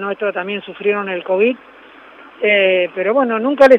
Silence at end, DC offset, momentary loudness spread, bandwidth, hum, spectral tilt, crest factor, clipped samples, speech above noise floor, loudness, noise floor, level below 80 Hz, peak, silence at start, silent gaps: 0 s; under 0.1%; 9 LU; 6.4 kHz; none; -6 dB/octave; 16 dB; under 0.1%; 26 dB; -16 LUFS; -41 dBFS; -60 dBFS; 0 dBFS; 0 s; none